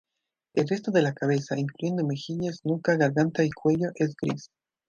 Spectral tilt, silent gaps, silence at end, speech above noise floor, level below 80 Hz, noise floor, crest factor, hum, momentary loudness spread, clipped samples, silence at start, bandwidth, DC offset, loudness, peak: -7 dB/octave; none; 0.45 s; 59 dB; -66 dBFS; -85 dBFS; 18 dB; none; 8 LU; under 0.1%; 0.55 s; 7.4 kHz; under 0.1%; -27 LUFS; -8 dBFS